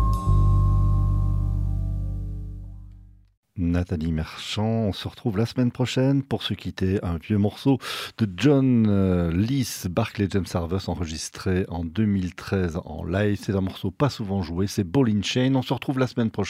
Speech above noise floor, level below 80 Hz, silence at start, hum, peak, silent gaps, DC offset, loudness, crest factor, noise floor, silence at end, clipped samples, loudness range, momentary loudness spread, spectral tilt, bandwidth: 24 dB; -32 dBFS; 0 s; none; -8 dBFS; 3.37-3.43 s; under 0.1%; -24 LUFS; 16 dB; -47 dBFS; 0 s; under 0.1%; 6 LU; 9 LU; -6.5 dB/octave; 15.5 kHz